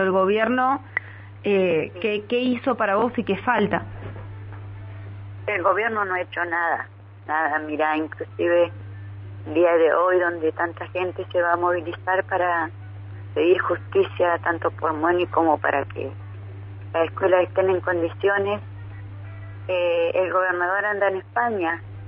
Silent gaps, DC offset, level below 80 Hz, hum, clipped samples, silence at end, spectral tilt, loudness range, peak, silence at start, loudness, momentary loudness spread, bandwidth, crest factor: none; under 0.1%; -56 dBFS; none; under 0.1%; 0 s; -10 dB/octave; 3 LU; -4 dBFS; 0 s; -22 LUFS; 18 LU; 5.4 kHz; 18 dB